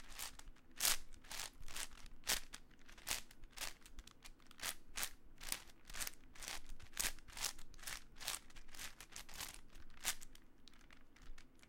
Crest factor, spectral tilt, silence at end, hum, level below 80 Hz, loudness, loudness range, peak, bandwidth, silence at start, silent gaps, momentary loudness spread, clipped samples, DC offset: 30 dB; 0.5 dB/octave; 0 s; none; -56 dBFS; -45 LUFS; 5 LU; -18 dBFS; 17 kHz; 0 s; none; 22 LU; under 0.1%; under 0.1%